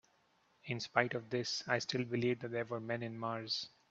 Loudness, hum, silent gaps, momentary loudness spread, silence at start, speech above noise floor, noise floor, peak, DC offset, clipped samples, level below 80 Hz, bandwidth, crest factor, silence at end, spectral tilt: -38 LUFS; none; none; 7 LU; 0.65 s; 36 dB; -73 dBFS; -12 dBFS; under 0.1%; under 0.1%; -78 dBFS; 7.8 kHz; 26 dB; 0.2 s; -4.5 dB/octave